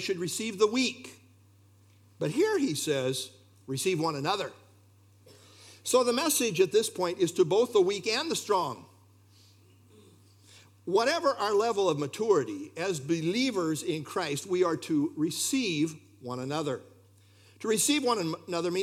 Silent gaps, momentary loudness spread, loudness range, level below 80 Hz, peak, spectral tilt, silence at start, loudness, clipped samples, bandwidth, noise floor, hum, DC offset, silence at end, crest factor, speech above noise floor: none; 11 LU; 5 LU; -84 dBFS; -12 dBFS; -4 dB/octave; 0 s; -29 LUFS; under 0.1%; 16.5 kHz; -60 dBFS; none; under 0.1%; 0 s; 18 dB; 31 dB